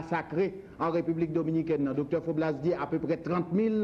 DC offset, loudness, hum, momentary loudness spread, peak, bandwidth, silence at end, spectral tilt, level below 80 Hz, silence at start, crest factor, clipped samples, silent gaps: under 0.1%; -30 LUFS; none; 3 LU; -16 dBFS; 6.8 kHz; 0 s; -9 dB/octave; -60 dBFS; 0 s; 12 dB; under 0.1%; none